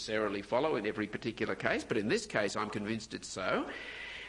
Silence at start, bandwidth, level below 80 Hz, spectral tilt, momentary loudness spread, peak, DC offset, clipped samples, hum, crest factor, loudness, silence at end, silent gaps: 0 s; 11 kHz; -62 dBFS; -4.5 dB/octave; 7 LU; -14 dBFS; under 0.1%; under 0.1%; none; 22 dB; -35 LUFS; 0 s; none